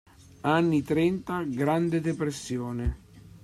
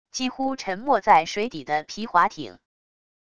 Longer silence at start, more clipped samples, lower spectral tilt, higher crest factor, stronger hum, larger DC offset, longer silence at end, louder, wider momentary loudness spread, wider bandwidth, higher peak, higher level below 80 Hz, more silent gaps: first, 0.45 s vs 0.15 s; neither; first, -6.5 dB/octave vs -3.5 dB/octave; about the same, 16 dB vs 20 dB; neither; second, under 0.1% vs 0.4%; second, 0.05 s vs 0.8 s; second, -28 LUFS vs -23 LUFS; about the same, 9 LU vs 11 LU; first, 13 kHz vs 10 kHz; second, -12 dBFS vs -4 dBFS; first, -44 dBFS vs -60 dBFS; neither